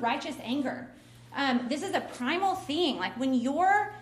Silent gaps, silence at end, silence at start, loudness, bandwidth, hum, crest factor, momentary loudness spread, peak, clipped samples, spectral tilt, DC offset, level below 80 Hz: none; 0 s; 0 s; -29 LUFS; 14.5 kHz; none; 16 dB; 9 LU; -14 dBFS; under 0.1%; -4 dB/octave; under 0.1%; -66 dBFS